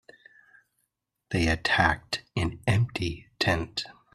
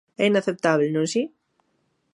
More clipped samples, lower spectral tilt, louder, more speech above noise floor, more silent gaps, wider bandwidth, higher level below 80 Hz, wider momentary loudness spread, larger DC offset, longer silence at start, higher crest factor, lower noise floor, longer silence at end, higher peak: neither; about the same, -5 dB/octave vs -5 dB/octave; second, -27 LUFS vs -23 LUFS; about the same, 52 dB vs 49 dB; neither; first, 13.5 kHz vs 11.5 kHz; first, -46 dBFS vs -72 dBFS; first, 10 LU vs 6 LU; neither; first, 1.3 s vs 0.2 s; about the same, 22 dB vs 20 dB; first, -79 dBFS vs -70 dBFS; second, 0.25 s vs 0.9 s; about the same, -6 dBFS vs -4 dBFS